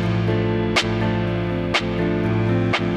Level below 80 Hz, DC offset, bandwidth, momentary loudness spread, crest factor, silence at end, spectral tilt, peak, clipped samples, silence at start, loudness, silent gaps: -38 dBFS; under 0.1%; 10.5 kHz; 3 LU; 14 dB; 0 s; -6 dB/octave; -8 dBFS; under 0.1%; 0 s; -21 LUFS; none